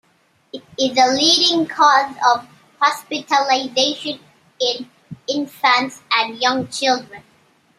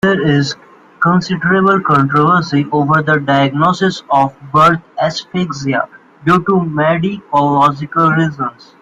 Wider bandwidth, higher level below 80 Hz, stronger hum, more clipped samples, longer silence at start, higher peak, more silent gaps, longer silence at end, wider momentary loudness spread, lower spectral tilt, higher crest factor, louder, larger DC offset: first, 15.5 kHz vs 9 kHz; second, -66 dBFS vs -50 dBFS; neither; neither; first, 0.55 s vs 0.05 s; about the same, 0 dBFS vs 0 dBFS; neither; first, 0.6 s vs 0.3 s; first, 15 LU vs 8 LU; second, -2 dB/octave vs -6.5 dB/octave; first, 18 dB vs 12 dB; second, -17 LUFS vs -13 LUFS; neither